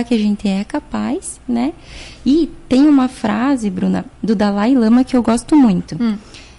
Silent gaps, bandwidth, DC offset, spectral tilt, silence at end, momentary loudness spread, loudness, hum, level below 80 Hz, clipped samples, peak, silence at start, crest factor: none; 11.5 kHz; under 0.1%; -6.5 dB/octave; 0.15 s; 10 LU; -16 LUFS; none; -40 dBFS; under 0.1%; -4 dBFS; 0 s; 10 dB